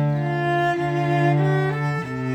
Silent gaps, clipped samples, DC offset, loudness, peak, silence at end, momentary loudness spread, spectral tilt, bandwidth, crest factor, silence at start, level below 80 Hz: none; under 0.1%; under 0.1%; -21 LUFS; -8 dBFS; 0 s; 6 LU; -8 dB/octave; 8.4 kHz; 12 dB; 0 s; -54 dBFS